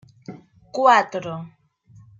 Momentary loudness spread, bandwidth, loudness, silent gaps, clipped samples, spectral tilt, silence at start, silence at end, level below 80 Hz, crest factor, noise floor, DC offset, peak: 26 LU; 7.6 kHz; -18 LUFS; none; under 0.1%; -4.5 dB/octave; 0.3 s; 0.7 s; -68 dBFS; 20 dB; -51 dBFS; under 0.1%; -2 dBFS